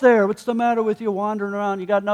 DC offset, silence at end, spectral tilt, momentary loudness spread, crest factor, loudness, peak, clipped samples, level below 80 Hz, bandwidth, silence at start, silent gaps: under 0.1%; 0 s; -6.5 dB/octave; 6 LU; 16 dB; -21 LUFS; -4 dBFS; under 0.1%; -68 dBFS; 12.5 kHz; 0 s; none